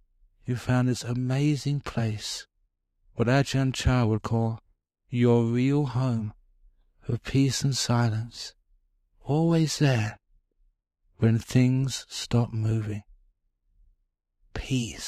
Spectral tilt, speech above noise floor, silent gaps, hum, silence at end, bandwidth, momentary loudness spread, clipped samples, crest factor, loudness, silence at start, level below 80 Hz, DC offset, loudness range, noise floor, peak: -6 dB/octave; 49 dB; none; none; 0 s; 14 kHz; 14 LU; under 0.1%; 18 dB; -26 LUFS; 0.45 s; -48 dBFS; under 0.1%; 3 LU; -74 dBFS; -10 dBFS